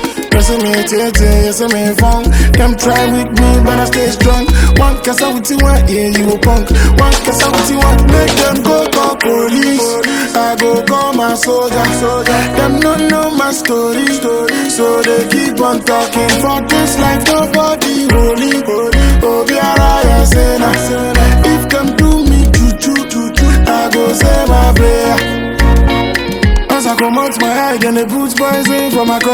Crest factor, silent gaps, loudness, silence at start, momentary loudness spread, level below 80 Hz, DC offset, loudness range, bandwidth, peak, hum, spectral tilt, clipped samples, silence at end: 10 dB; none; -10 LUFS; 0 s; 3 LU; -14 dBFS; under 0.1%; 2 LU; 19.5 kHz; 0 dBFS; none; -4.5 dB/octave; 0.2%; 0 s